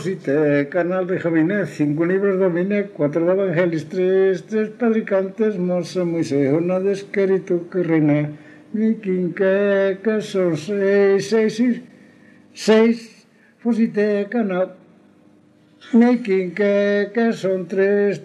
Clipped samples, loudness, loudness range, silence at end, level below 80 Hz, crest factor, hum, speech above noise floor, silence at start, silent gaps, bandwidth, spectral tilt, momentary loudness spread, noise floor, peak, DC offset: under 0.1%; -19 LUFS; 2 LU; 0 s; -72 dBFS; 16 dB; none; 34 dB; 0 s; none; 11 kHz; -7 dB/octave; 6 LU; -52 dBFS; -2 dBFS; under 0.1%